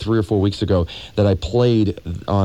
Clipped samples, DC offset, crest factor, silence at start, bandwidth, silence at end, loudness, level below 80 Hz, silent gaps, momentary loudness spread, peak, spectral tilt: under 0.1%; 0.3%; 12 dB; 0 s; 10.5 kHz; 0 s; -19 LUFS; -36 dBFS; none; 6 LU; -6 dBFS; -8 dB/octave